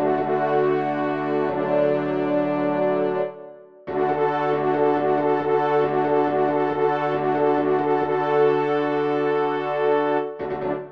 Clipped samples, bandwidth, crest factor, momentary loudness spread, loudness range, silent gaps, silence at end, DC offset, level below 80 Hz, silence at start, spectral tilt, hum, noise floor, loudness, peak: under 0.1%; 6 kHz; 14 dB; 5 LU; 2 LU; none; 0 s; 0.2%; -64 dBFS; 0 s; -8.5 dB/octave; none; -42 dBFS; -22 LUFS; -8 dBFS